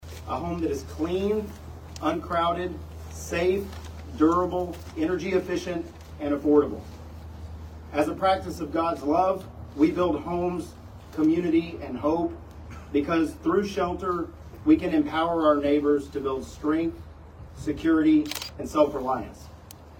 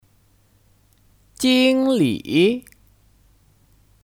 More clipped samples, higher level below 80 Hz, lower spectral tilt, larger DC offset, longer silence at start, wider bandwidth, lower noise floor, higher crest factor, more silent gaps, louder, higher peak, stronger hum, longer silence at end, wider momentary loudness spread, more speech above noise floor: neither; first, -46 dBFS vs -58 dBFS; first, -6.5 dB/octave vs -5 dB/octave; neither; second, 0 s vs 1.4 s; about the same, 17.5 kHz vs 16 kHz; second, -46 dBFS vs -58 dBFS; about the same, 18 dB vs 18 dB; neither; second, -26 LUFS vs -18 LUFS; second, -8 dBFS vs -4 dBFS; neither; second, 0 s vs 1.45 s; first, 19 LU vs 6 LU; second, 21 dB vs 41 dB